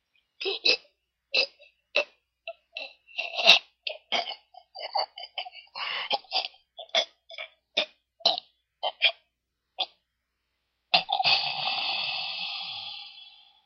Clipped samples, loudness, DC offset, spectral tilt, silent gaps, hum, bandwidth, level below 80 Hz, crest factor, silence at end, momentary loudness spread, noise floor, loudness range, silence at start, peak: under 0.1%; -27 LUFS; under 0.1%; -0.5 dB/octave; none; none; 13 kHz; -82 dBFS; 30 dB; 0.35 s; 18 LU; -81 dBFS; 6 LU; 0.4 s; 0 dBFS